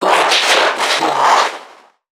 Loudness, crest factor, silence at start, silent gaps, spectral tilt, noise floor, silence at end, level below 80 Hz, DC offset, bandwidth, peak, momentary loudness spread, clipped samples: -12 LUFS; 14 dB; 0 s; none; -0.5 dB/octave; -42 dBFS; 0.5 s; -76 dBFS; under 0.1%; 19 kHz; 0 dBFS; 7 LU; under 0.1%